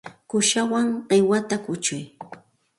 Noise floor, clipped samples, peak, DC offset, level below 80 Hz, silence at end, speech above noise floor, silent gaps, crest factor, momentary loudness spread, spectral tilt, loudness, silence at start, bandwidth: -47 dBFS; under 0.1%; -6 dBFS; under 0.1%; -68 dBFS; 0.4 s; 25 dB; none; 16 dB; 19 LU; -3.5 dB/octave; -22 LUFS; 0.05 s; 11.5 kHz